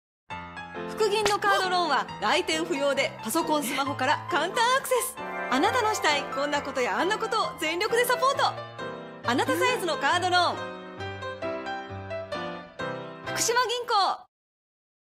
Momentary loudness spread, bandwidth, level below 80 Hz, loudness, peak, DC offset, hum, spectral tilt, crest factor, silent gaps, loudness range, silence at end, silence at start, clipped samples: 13 LU; 16 kHz; -64 dBFS; -26 LUFS; -8 dBFS; under 0.1%; none; -2.5 dB/octave; 18 dB; none; 4 LU; 0.9 s; 0.3 s; under 0.1%